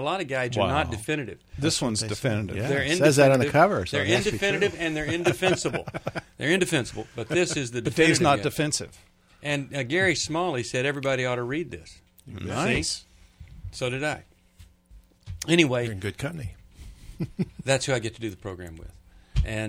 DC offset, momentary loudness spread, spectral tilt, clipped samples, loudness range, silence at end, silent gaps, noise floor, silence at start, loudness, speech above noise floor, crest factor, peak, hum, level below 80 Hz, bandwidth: under 0.1%; 16 LU; -4.5 dB/octave; under 0.1%; 8 LU; 0 s; none; -54 dBFS; 0 s; -25 LUFS; 29 dB; 22 dB; -4 dBFS; none; -44 dBFS; 16.5 kHz